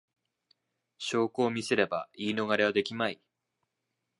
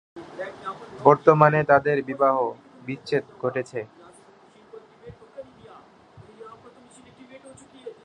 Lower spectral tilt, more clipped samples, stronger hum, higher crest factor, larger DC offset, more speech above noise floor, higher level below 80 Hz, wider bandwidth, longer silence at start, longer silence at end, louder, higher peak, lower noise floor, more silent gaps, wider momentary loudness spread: second, -4.5 dB/octave vs -7.5 dB/octave; neither; neither; about the same, 24 dB vs 24 dB; neither; first, 54 dB vs 31 dB; second, -74 dBFS vs -64 dBFS; first, 11.5 kHz vs 10 kHz; first, 1 s vs 0.15 s; first, 1.05 s vs 0.15 s; second, -30 LUFS vs -21 LUFS; second, -10 dBFS vs -2 dBFS; first, -84 dBFS vs -53 dBFS; neither; second, 7 LU vs 27 LU